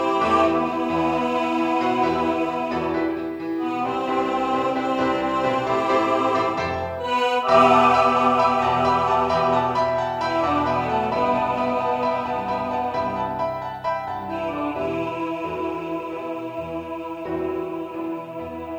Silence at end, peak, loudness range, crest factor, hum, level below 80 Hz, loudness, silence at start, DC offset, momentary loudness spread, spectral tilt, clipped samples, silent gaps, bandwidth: 0 s; -4 dBFS; 9 LU; 18 dB; none; -50 dBFS; -22 LUFS; 0 s; under 0.1%; 11 LU; -6 dB/octave; under 0.1%; none; 16.5 kHz